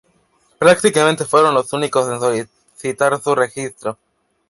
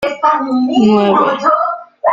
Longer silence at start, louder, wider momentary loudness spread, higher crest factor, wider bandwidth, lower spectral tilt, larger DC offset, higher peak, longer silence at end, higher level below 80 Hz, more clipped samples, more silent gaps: first, 0.6 s vs 0 s; second, -16 LUFS vs -13 LUFS; first, 14 LU vs 6 LU; about the same, 16 dB vs 12 dB; first, 11.5 kHz vs 7.4 kHz; second, -4 dB/octave vs -6.5 dB/octave; neither; about the same, -2 dBFS vs -2 dBFS; first, 0.55 s vs 0 s; second, -62 dBFS vs -54 dBFS; neither; neither